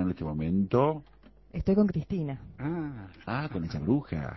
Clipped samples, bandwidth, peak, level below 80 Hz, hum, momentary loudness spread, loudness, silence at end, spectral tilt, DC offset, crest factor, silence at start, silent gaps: under 0.1%; 6 kHz; -12 dBFS; -48 dBFS; none; 12 LU; -30 LUFS; 0 s; -10 dB/octave; under 0.1%; 18 dB; 0 s; none